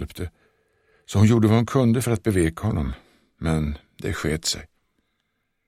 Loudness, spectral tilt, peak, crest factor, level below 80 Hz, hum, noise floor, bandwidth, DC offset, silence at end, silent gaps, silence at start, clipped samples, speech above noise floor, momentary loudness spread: -22 LUFS; -6 dB/octave; -4 dBFS; 18 dB; -40 dBFS; none; -74 dBFS; 15.5 kHz; under 0.1%; 1.05 s; none; 0 s; under 0.1%; 53 dB; 14 LU